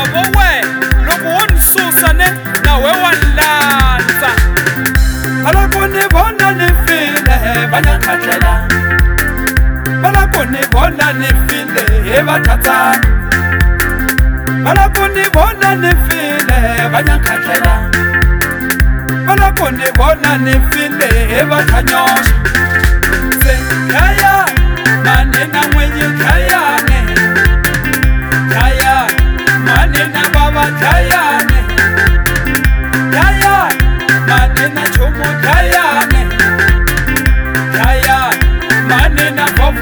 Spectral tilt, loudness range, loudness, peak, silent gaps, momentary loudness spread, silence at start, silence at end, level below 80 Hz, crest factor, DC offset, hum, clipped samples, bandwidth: -4.5 dB/octave; 2 LU; -10 LUFS; 0 dBFS; none; 4 LU; 0 s; 0 s; -14 dBFS; 10 dB; under 0.1%; none; 0.3%; over 20 kHz